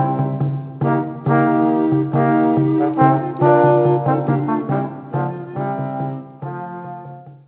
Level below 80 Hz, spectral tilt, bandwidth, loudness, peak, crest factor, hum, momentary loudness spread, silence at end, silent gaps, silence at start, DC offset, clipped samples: -58 dBFS; -13 dB/octave; 4 kHz; -18 LUFS; -2 dBFS; 16 dB; none; 15 LU; 0.1 s; none; 0 s; under 0.1%; under 0.1%